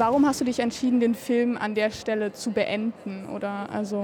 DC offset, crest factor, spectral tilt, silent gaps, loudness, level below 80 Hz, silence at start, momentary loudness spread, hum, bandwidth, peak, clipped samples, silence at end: under 0.1%; 14 dB; -5 dB/octave; none; -26 LUFS; -60 dBFS; 0 s; 9 LU; none; 18 kHz; -10 dBFS; under 0.1%; 0 s